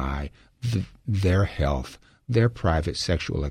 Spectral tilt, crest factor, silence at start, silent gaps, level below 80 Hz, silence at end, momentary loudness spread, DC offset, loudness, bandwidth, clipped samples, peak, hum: -6.5 dB/octave; 18 dB; 0 s; none; -34 dBFS; 0 s; 11 LU; under 0.1%; -26 LUFS; 12 kHz; under 0.1%; -8 dBFS; none